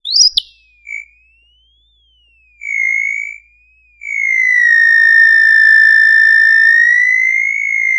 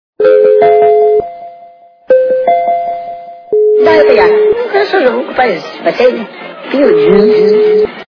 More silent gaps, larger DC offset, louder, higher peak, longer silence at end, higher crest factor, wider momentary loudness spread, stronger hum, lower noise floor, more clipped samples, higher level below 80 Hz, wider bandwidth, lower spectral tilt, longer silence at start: neither; neither; about the same, -8 LUFS vs -9 LUFS; about the same, 0 dBFS vs 0 dBFS; about the same, 0 s vs 0.05 s; about the same, 12 dB vs 8 dB; first, 20 LU vs 14 LU; neither; first, -54 dBFS vs -38 dBFS; second, under 0.1% vs 0.5%; second, -56 dBFS vs -48 dBFS; first, 11.5 kHz vs 5.4 kHz; second, 5.5 dB/octave vs -7 dB/octave; second, 0.05 s vs 0.2 s